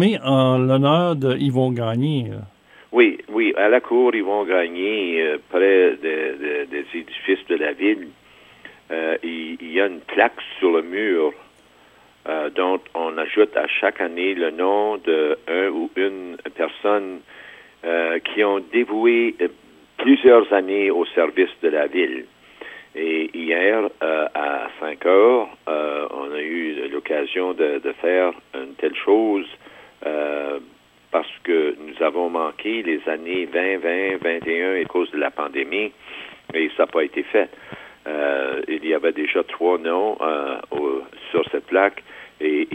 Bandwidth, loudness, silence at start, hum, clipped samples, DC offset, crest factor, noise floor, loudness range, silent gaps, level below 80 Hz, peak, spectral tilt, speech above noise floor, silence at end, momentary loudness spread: 9.8 kHz; -20 LUFS; 0 s; none; under 0.1%; under 0.1%; 18 dB; -52 dBFS; 5 LU; none; -66 dBFS; -2 dBFS; -7.5 dB/octave; 32 dB; 0 s; 12 LU